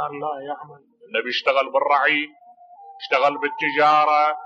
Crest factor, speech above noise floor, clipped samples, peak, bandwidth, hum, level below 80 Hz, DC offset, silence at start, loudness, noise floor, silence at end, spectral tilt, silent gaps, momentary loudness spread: 16 dB; 24 dB; under 0.1%; -6 dBFS; 7.6 kHz; none; -78 dBFS; under 0.1%; 0 s; -20 LUFS; -45 dBFS; 0 s; -4 dB/octave; none; 16 LU